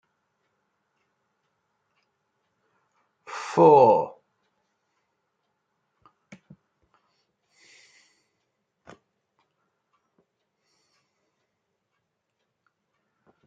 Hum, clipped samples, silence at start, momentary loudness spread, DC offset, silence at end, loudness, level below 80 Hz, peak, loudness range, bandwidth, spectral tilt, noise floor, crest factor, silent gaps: none; under 0.1%; 3.3 s; 22 LU; under 0.1%; 9.35 s; -18 LUFS; -80 dBFS; -4 dBFS; 7 LU; 8 kHz; -7 dB/octave; -79 dBFS; 26 dB; none